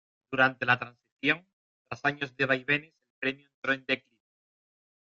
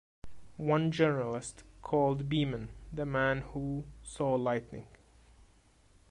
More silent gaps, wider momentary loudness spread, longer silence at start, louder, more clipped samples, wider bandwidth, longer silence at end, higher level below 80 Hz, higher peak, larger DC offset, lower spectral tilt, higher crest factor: first, 1.12-1.17 s, 1.53-1.85 s, 3.10-3.22 s, 3.54-3.62 s vs none; second, 9 LU vs 17 LU; about the same, 0.3 s vs 0.25 s; first, -29 LUFS vs -33 LUFS; neither; second, 7.6 kHz vs 11 kHz; about the same, 1.2 s vs 1.2 s; second, -72 dBFS vs -54 dBFS; first, -8 dBFS vs -16 dBFS; neither; about the same, -5.5 dB/octave vs -6.5 dB/octave; first, 24 dB vs 18 dB